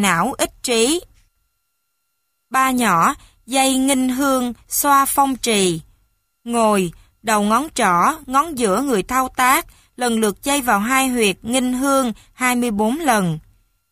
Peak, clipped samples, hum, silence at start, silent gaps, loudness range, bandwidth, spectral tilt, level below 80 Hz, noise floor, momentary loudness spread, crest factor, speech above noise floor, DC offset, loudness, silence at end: 0 dBFS; under 0.1%; none; 0 s; none; 2 LU; 15.5 kHz; -3.5 dB/octave; -48 dBFS; -72 dBFS; 7 LU; 18 dB; 55 dB; under 0.1%; -18 LUFS; 0.5 s